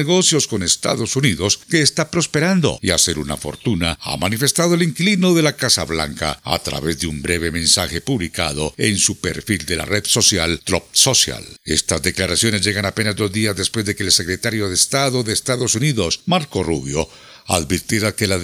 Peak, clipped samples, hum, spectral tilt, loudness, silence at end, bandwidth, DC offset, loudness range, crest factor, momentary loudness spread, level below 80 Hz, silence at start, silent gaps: 0 dBFS; under 0.1%; none; -3 dB/octave; -17 LUFS; 0 s; 18 kHz; under 0.1%; 2 LU; 18 dB; 8 LU; -42 dBFS; 0 s; none